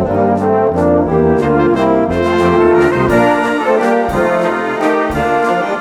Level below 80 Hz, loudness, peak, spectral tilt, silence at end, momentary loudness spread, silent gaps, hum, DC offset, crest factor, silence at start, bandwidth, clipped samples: -34 dBFS; -12 LUFS; 0 dBFS; -7 dB/octave; 0 s; 4 LU; none; none; under 0.1%; 12 dB; 0 s; 13.5 kHz; under 0.1%